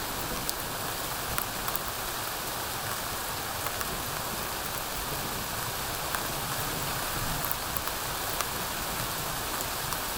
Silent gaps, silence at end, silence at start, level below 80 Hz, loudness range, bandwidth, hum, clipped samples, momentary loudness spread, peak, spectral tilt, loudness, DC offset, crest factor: none; 0 s; 0 s; -46 dBFS; 1 LU; 19 kHz; none; under 0.1%; 2 LU; -6 dBFS; -2 dB/octave; -31 LUFS; under 0.1%; 26 dB